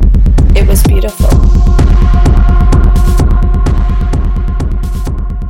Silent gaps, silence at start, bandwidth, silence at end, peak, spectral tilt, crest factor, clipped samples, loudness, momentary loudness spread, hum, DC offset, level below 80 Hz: none; 0 s; 16 kHz; 0 s; 0 dBFS; -7 dB/octave; 6 dB; under 0.1%; -10 LUFS; 7 LU; none; under 0.1%; -8 dBFS